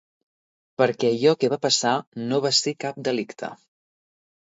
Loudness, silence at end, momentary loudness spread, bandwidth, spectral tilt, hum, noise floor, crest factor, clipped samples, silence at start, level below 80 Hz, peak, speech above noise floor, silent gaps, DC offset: -22 LUFS; 0.9 s; 13 LU; 8 kHz; -3.5 dB/octave; none; under -90 dBFS; 18 dB; under 0.1%; 0.8 s; -72 dBFS; -6 dBFS; over 67 dB; 2.07-2.12 s; under 0.1%